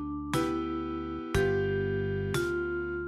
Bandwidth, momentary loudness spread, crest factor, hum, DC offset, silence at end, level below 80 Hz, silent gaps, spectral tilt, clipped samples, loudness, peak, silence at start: 15.5 kHz; 6 LU; 16 dB; none; under 0.1%; 0 s; -46 dBFS; none; -6.5 dB/octave; under 0.1%; -31 LUFS; -14 dBFS; 0 s